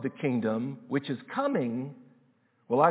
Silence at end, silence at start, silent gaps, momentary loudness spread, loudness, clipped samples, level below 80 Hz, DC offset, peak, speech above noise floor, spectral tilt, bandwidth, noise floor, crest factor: 0 s; 0 s; none; 6 LU; -31 LUFS; under 0.1%; -82 dBFS; under 0.1%; -8 dBFS; 37 dB; -6.5 dB/octave; 4 kHz; -67 dBFS; 20 dB